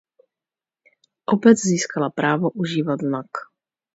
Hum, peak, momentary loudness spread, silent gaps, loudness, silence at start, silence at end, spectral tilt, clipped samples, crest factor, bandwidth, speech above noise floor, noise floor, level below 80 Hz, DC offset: none; -2 dBFS; 16 LU; none; -20 LUFS; 1.3 s; 0.5 s; -5.5 dB/octave; under 0.1%; 20 dB; 8 kHz; over 70 dB; under -90 dBFS; -68 dBFS; under 0.1%